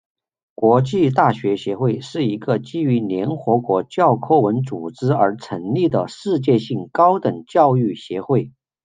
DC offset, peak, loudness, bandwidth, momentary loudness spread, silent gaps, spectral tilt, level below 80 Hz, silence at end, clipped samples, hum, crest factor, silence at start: under 0.1%; -2 dBFS; -19 LUFS; 9.2 kHz; 7 LU; none; -8 dB/octave; -60 dBFS; 0.35 s; under 0.1%; none; 16 dB; 0.6 s